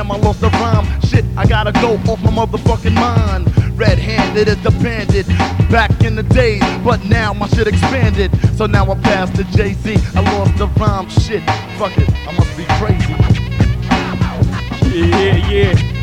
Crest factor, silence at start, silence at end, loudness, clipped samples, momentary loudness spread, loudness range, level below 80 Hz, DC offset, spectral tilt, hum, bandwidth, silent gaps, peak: 12 dB; 0 s; 0 s; -14 LUFS; under 0.1%; 4 LU; 2 LU; -20 dBFS; under 0.1%; -7 dB/octave; none; 11 kHz; none; -2 dBFS